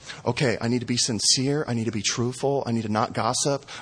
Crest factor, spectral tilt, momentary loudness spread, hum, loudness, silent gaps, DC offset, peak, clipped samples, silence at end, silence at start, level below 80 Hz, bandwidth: 18 dB; -3.5 dB/octave; 6 LU; none; -24 LUFS; none; under 0.1%; -8 dBFS; under 0.1%; 0 s; 0 s; -58 dBFS; 10.5 kHz